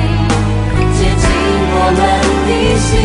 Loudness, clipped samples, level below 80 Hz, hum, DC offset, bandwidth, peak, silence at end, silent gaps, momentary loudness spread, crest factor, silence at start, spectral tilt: -12 LUFS; under 0.1%; -18 dBFS; none; under 0.1%; 11 kHz; 0 dBFS; 0 s; none; 3 LU; 12 dB; 0 s; -5.5 dB/octave